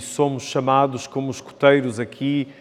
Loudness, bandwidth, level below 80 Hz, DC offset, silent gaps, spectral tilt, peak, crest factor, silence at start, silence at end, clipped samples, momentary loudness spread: -21 LUFS; 13.5 kHz; -70 dBFS; under 0.1%; none; -5.5 dB/octave; 0 dBFS; 20 dB; 0 s; 0.1 s; under 0.1%; 11 LU